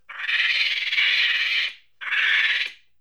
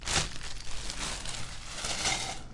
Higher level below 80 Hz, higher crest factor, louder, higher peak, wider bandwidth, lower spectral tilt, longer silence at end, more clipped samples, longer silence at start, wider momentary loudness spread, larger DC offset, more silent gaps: second, -80 dBFS vs -44 dBFS; about the same, 16 dB vs 20 dB; first, -20 LUFS vs -34 LUFS; first, -8 dBFS vs -12 dBFS; first, over 20 kHz vs 11.5 kHz; second, 3.5 dB/octave vs -1.5 dB/octave; first, 0.25 s vs 0 s; neither; about the same, 0.1 s vs 0 s; second, 8 LU vs 11 LU; first, 0.1% vs under 0.1%; neither